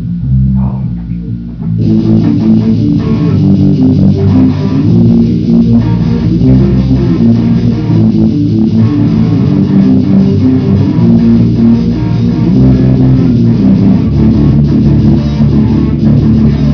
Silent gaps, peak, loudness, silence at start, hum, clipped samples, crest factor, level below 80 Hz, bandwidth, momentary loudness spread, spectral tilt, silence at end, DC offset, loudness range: none; 0 dBFS; -8 LUFS; 0 s; none; 0.6%; 6 dB; -22 dBFS; 5.4 kHz; 4 LU; -10.5 dB/octave; 0 s; 0.4%; 1 LU